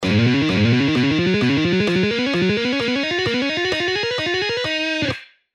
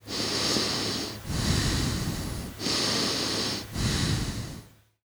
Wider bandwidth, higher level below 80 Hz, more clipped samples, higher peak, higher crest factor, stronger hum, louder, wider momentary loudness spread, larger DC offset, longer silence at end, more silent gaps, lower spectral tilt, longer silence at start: second, 11 kHz vs over 20 kHz; second, -50 dBFS vs -40 dBFS; neither; first, -6 dBFS vs -12 dBFS; about the same, 12 dB vs 16 dB; neither; first, -19 LUFS vs -27 LUFS; second, 4 LU vs 9 LU; neither; about the same, 0.3 s vs 0.4 s; neither; first, -5.5 dB/octave vs -3.5 dB/octave; about the same, 0 s vs 0.05 s